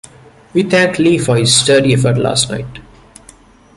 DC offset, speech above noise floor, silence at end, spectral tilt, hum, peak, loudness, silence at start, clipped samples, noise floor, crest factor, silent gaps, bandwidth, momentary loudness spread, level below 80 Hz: under 0.1%; 31 dB; 0.95 s; -4 dB/octave; none; 0 dBFS; -12 LUFS; 0.55 s; under 0.1%; -43 dBFS; 14 dB; none; 11.5 kHz; 10 LU; -44 dBFS